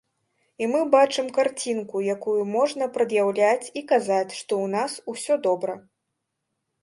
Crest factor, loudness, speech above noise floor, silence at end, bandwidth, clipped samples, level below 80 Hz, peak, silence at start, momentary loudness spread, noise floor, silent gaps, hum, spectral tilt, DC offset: 20 dB; -24 LUFS; 57 dB; 1 s; 11.5 kHz; under 0.1%; -76 dBFS; -4 dBFS; 0.6 s; 8 LU; -80 dBFS; none; none; -4 dB/octave; under 0.1%